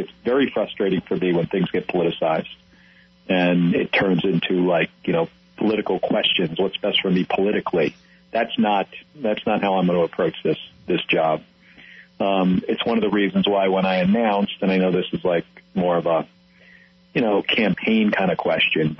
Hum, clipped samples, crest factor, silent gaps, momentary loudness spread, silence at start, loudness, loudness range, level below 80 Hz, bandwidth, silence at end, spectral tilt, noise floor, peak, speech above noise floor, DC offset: none; under 0.1%; 14 dB; none; 7 LU; 0 s; -21 LUFS; 2 LU; -58 dBFS; 6 kHz; 0.05 s; -8.5 dB/octave; -53 dBFS; -8 dBFS; 32 dB; under 0.1%